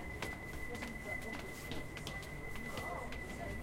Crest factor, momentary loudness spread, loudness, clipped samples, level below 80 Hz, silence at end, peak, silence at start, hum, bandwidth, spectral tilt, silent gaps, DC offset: 18 dB; 3 LU; -44 LUFS; under 0.1%; -52 dBFS; 0 s; -24 dBFS; 0 s; none; 16.5 kHz; -4.5 dB/octave; none; under 0.1%